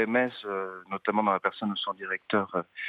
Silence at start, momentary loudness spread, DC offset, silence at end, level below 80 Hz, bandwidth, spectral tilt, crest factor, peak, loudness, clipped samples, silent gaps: 0 s; 8 LU; under 0.1%; 0 s; -82 dBFS; 5 kHz; -7.5 dB/octave; 20 dB; -10 dBFS; -29 LUFS; under 0.1%; none